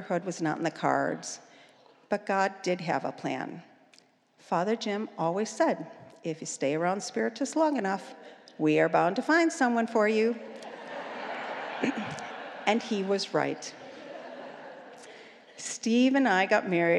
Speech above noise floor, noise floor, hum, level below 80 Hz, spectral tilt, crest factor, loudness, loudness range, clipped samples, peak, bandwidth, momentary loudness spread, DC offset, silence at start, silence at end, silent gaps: 34 dB; -62 dBFS; none; -86 dBFS; -4.5 dB/octave; 20 dB; -29 LUFS; 6 LU; under 0.1%; -8 dBFS; 11.5 kHz; 19 LU; under 0.1%; 0 s; 0 s; none